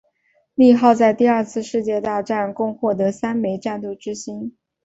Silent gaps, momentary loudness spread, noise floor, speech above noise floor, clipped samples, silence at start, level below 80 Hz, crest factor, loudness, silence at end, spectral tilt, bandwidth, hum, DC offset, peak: none; 16 LU; -64 dBFS; 46 dB; under 0.1%; 0.6 s; -60 dBFS; 16 dB; -19 LUFS; 0.35 s; -6 dB/octave; 8 kHz; none; under 0.1%; -2 dBFS